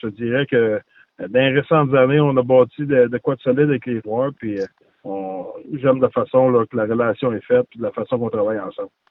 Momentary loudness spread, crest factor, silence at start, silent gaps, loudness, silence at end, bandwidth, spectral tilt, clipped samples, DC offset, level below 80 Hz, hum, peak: 14 LU; 16 dB; 0.05 s; none; -19 LUFS; 0.25 s; 5.2 kHz; -9.5 dB/octave; under 0.1%; under 0.1%; -60 dBFS; none; -2 dBFS